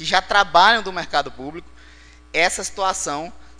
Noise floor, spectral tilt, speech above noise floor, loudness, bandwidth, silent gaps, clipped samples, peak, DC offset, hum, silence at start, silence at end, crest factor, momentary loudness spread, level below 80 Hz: -46 dBFS; -1.5 dB/octave; 27 dB; -18 LUFS; 10 kHz; none; under 0.1%; 0 dBFS; under 0.1%; none; 0 s; 0.05 s; 20 dB; 18 LU; -46 dBFS